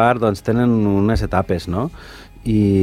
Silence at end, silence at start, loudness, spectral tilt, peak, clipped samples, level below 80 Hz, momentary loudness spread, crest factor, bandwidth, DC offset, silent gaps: 0 s; 0 s; -18 LUFS; -8 dB/octave; 0 dBFS; under 0.1%; -32 dBFS; 13 LU; 16 dB; 14.5 kHz; under 0.1%; none